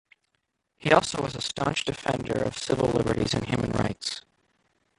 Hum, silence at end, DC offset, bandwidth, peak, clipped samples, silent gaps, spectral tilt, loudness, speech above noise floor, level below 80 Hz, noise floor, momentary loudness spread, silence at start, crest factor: none; 0.8 s; under 0.1%; 11.5 kHz; -4 dBFS; under 0.1%; none; -5 dB/octave; -27 LUFS; 50 dB; -50 dBFS; -77 dBFS; 9 LU; 0.85 s; 24 dB